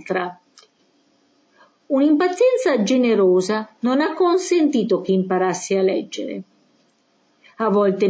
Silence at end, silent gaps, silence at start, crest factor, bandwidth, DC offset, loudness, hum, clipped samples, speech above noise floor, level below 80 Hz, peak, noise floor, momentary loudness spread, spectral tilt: 0 s; none; 0.05 s; 12 dB; 8 kHz; under 0.1%; -19 LUFS; none; under 0.1%; 44 dB; -72 dBFS; -8 dBFS; -62 dBFS; 9 LU; -5.5 dB/octave